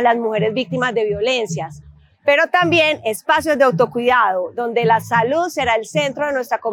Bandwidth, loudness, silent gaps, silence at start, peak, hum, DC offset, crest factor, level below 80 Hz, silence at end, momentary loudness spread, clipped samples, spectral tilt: 18 kHz; -17 LUFS; none; 0 s; -4 dBFS; none; under 0.1%; 14 dB; -54 dBFS; 0 s; 7 LU; under 0.1%; -4.5 dB/octave